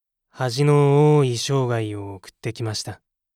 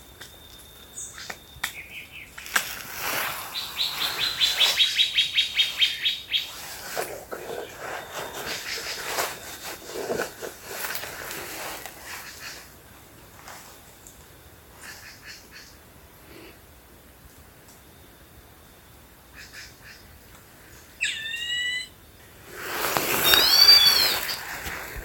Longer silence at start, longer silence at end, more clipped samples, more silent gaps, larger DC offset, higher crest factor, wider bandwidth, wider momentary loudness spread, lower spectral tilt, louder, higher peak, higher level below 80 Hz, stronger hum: first, 0.35 s vs 0 s; first, 0.4 s vs 0 s; neither; neither; neither; second, 14 dB vs 28 dB; second, 13.5 kHz vs 17 kHz; second, 17 LU vs 24 LU; first, -6 dB/octave vs 0 dB/octave; about the same, -20 LUFS vs -22 LUFS; second, -6 dBFS vs 0 dBFS; second, -66 dBFS vs -54 dBFS; neither